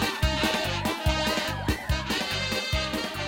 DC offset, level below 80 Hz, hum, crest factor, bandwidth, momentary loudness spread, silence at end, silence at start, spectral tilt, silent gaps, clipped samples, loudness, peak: under 0.1%; -36 dBFS; none; 16 dB; 17 kHz; 3 LU; 0 s; 0 s; -4 dB/octave; none; under 0.1%; -27 LUFS; -12 dBFS